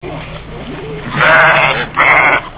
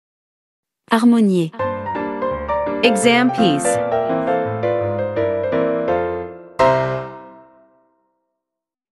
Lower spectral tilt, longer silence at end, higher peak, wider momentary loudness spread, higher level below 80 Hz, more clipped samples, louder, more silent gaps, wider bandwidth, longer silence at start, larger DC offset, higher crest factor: first, -7.5 dB/octave vs -5 dB/octave; second, 0 s vs 1.5 s; about the same, 0 dBFS vs 0 dBFS; first, 20 LU vs 10 LU; first, -36 dBFS vs -48 dBFS; neither; first, -8 LUFS vs -18 LUFS; neither; second, 4 kHz vs 12 kHz; second, 0.05 s vs 0.9 s; neither; second, 12 dB vs 18 dB